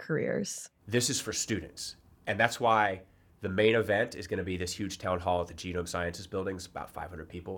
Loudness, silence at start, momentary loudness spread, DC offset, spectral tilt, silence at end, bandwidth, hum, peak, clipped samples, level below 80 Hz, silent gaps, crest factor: -31 LUFS; 0 s; 15 LU; under 0.1%; -4 dB/octave; 0 s; 19 kHz; none; -6 dBFS; under 0.1%; -60 dBFS; none; 24 dB